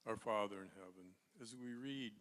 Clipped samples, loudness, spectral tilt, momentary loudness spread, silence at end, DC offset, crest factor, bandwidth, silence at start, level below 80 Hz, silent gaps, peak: under 0.1%; -46 LUFS; -4.5 dB/octave; 19 LU; 0 s; under 0.1%; 20 dB; 13.5 kHz; 0.05 s; -84 dBFS; none; -28 dBFS